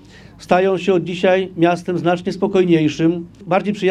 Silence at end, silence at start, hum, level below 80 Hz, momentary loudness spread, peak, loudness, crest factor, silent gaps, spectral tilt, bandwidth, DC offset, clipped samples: 0 s; 0.4 s; none; -52 dBFS; 5 LU; 0 dBFS; -17 LUFS; 16 dB; none; -7 dB/octave; 10 kHz; under 0.1%; under 0.1%